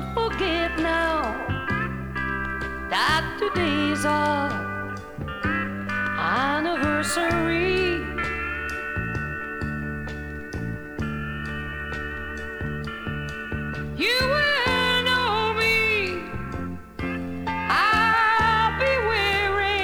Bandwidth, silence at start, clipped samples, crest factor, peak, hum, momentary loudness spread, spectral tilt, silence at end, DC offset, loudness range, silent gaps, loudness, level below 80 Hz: over 20 kHz; 0 s; under 0.1%; 18 dB; -8 dBFS; none; 12 LU; -4.5 dB/octave; 0 s; under 0.1%; 9 LU; none; -24 LUFS; -40 dBFS